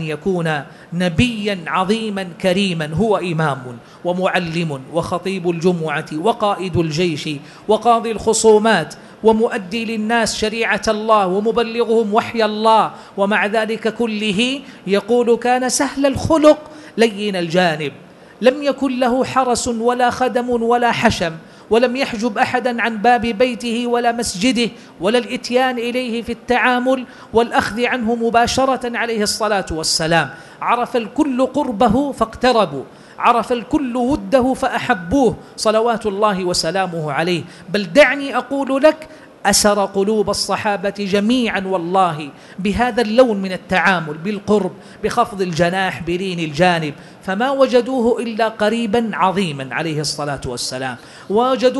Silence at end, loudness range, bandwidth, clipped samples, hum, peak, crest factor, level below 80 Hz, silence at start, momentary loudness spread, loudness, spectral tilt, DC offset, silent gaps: 0 s; 3 LU; 12 kHz; under 0.1%; none; 0 dBFS; 16 dB; -44 dBFS; 0 s; 8 LU; -17 LUFS; -4.5 dB/octave; under 0.1%; none